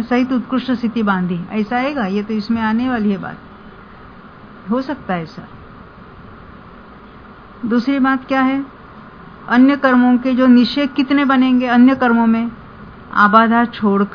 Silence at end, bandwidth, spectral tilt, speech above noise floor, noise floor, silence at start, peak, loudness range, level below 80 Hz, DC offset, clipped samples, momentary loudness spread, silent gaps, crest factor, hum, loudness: 0 s; 5.4 kHz; -7.5 dB/octave; 24 dB; -38 dBFS; 0 s; 0 dBFS; 14 LU; -48 dBFS; under 0.1%; under 0.1%; 13 LU; none; 16 dB; none; -15 LUFS